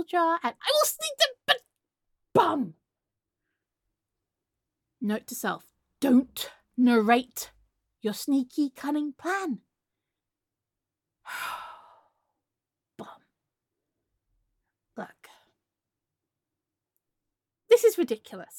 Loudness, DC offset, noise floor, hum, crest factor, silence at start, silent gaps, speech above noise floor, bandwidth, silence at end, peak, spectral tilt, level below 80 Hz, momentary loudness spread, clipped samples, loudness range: -26 LUFS; under 0.1%; -89 dBFS; none; 24 dB; 0 s; none; 62 dB; 17.5 kHz; 0 s; -6 dBFS; -3.5 dB/octave; -74 dBFS; 20 LU; under 0.1%; 17 LU